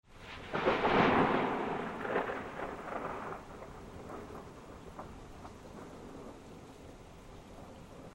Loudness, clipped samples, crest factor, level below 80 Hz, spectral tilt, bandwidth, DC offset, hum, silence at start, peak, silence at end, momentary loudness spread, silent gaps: -33 LUFS; under 0.1%; 22 dB; -56 dBFS; -6 dB/octave; 16 kHz; under 0.1%; none; 0.1 s; -14 dBFS; 0 s; 23 LU; none